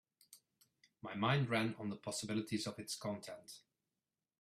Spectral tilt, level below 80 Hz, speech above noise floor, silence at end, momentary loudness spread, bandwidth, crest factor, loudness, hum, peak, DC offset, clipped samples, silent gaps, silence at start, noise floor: -5 dB/octave; -78 dBFS; over 50 dB; 0.8 s; 18 LU; 15 kHz; 22 dB; -40 LUFS; none; -20 dBFS; under 0.1%; under 0.1%; none; 0.3 s; under -90 dBFS